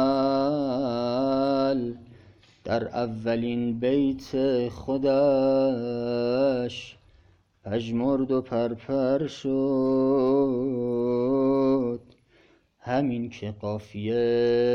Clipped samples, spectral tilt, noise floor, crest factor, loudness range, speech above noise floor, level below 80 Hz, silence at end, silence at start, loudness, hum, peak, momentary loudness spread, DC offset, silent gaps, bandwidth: under 0.1%; -7.5 dB/octave; -60 dBFS; 14 dB; 3 LU; 36 dB; -56 dBFS; 0 s; 0 s; -25 LUFS; none; -12 dBFS; 10 LU; under 0.1%; none; 7 kHz